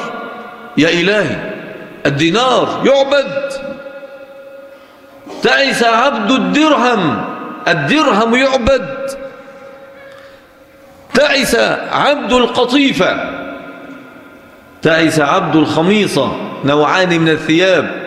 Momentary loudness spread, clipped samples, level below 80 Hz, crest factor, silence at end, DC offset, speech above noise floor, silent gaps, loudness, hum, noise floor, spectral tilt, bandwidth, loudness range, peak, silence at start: 18 LU; under 0.1%; -42 dBFS; 14 dB; 0 s; under 0.1%; 30 dB; none; -12 LUFS; none; -42 dBFS; -4.5 dB/octave; 15 kHz; 4 LU; 0 dBFS; 0 s